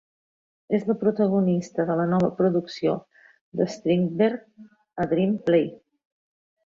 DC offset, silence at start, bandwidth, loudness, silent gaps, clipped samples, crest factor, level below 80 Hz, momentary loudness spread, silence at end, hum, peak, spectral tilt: under 0.1%; 0.7 s; 7.4 kHz; -24 LUFS; 3.41-3.52 s; under 0.1%; 18 dB; -64 dBFS; 9 LU; 0.9 s; none; -8 dBFS; -8 dB/octave